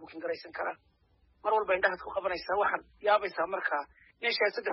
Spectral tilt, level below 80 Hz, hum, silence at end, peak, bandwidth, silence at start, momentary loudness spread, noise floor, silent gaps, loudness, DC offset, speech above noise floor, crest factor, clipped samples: 0.5 dB/octave; -66 dBFS; none; 0 s; -12 dBFS; 5.8 kHz; 0 s; 10 LU; -68 dBFS; none; -31 LUFS; under 0.1%; 37 dB; 20 dB; under 0.1%